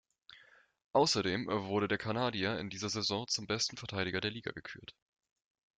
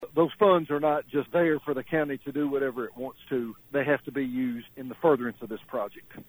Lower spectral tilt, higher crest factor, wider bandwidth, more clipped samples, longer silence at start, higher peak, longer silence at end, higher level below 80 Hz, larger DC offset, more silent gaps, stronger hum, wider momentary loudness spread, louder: second, -3.5 dB/octave vs -8 dB/octave; about the same, 20 dB vs 18 dB; second, 9.4 kHz vs over 20 kHz; neither; first, 0.3 s vs 0 s; second, -16 dBFS vs -10 dBFS; first, 0.85 s vs 0.05 s; about the same, -70 dBFS vs -66 dBFS; neither; first, 0.84-0.91 s vs none; neither; about the same, 13 LU vs 13 LU; second, -34 LUFS vs -28 LUFS